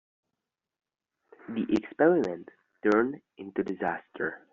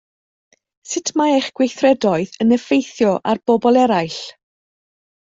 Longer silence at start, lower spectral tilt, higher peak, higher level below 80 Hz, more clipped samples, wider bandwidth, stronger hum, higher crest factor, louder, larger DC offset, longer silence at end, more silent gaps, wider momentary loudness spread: first, 1.5 s vs 0.85 s; about the same, -5.5 dB/octave vs -4.5 dB/octave; second, -10 dBFS vs -2 dBFS; second, -68 dBFS vs -60 dBFS; neither; second, 7 kHz vs 7.8 kHz; neither; about the same, 20 dB vs 16 dB; second, -29 LUFS vs -17 LUFS; neither; second, 0.15 s vs 1 s; neither; first, 13 LU vs 10 LU